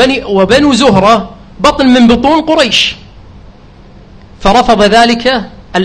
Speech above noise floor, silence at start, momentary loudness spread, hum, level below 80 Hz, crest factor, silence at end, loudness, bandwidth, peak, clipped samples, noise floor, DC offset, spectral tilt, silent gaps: 28 dB; 0 s; 8 LU; none; -30 dBFS; 8 dB; 0 s; -8 LUFS; 11 kHz; 0 dBFS; 0.9%; -35 dBFS; under 0.1%; -4.5 dB/octave; none